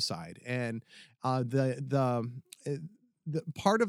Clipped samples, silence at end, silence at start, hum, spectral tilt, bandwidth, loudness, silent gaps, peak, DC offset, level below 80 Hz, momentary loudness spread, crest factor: under 0.1%; 0 s; 0 s; none; -6 dB/octave; 14 kHz; -34 LUFS; none; -10 dBFS; under 0.1%; -72 dBFS; 13 LU; 22 dB